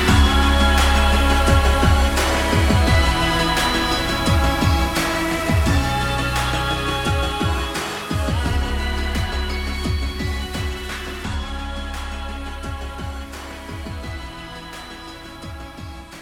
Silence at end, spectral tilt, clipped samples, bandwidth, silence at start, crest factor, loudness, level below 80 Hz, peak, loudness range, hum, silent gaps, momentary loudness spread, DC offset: 0 s; -4.5 dB/octave; under 0.1%; 17 kHz; 0 s; 16 dB; -20 LUFS; -24 dBFS; -4 dBFS; 14 LU; none; none; 18 LU; under 0.1%